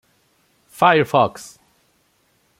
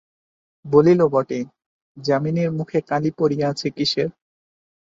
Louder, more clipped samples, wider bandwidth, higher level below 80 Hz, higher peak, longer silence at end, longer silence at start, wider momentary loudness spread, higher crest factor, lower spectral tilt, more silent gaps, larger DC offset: first, -17 LUFS vs -20 LUFS; neither; first, 16.5 kHz vs 7.8 kHz; about the same, -62 dBFS vs -60 dBFS; about the same, -2 dBFS vs -2 dBFS; first, 1.15 s vs 0.85 s; first, 0.8 s vs 0.65 s; first, 24 LU vs 12 LU; about the same, 20 dB vs 18 dB; second, -5 dB/octave vs -6.5 dB/octave; second, none vs 1.66-1.95 s; neither